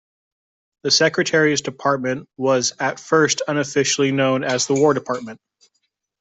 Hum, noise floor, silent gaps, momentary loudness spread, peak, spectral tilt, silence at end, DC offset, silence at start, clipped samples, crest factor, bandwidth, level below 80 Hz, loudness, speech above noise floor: none; -72 dBFS; none; 9 LU; -4 dBFS; -3.5 dB/octave; 0.85 s; under 0.1%; 0.85 s; under 0.1%; 18 dB; 8.4 kHz; -64 dBFS; -19 LUFS; 53 dB